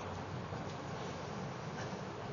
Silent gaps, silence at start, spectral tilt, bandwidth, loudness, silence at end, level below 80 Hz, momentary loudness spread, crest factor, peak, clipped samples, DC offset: none; 0 s; -5 dB/octave; 7.2 kHz; -43 LUFS; 0 s; -64 dBFS; 1 LU; 12 dB; -30 dBFS; under 0.1%; under 0.1%